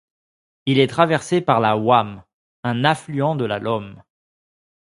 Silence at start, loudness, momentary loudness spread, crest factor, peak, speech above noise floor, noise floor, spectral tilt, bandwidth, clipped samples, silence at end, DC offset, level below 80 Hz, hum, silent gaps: 0.65 s; -19 LUFS; 12 LU; 20 dB; 0 dBFS; over 71 dB; under -90 dBFS; -6 dB/octave; 11.5 kHz; under 0.1%; 0.85 s; under 0.1%; -58 dBFS; none; 2.34-2.63 s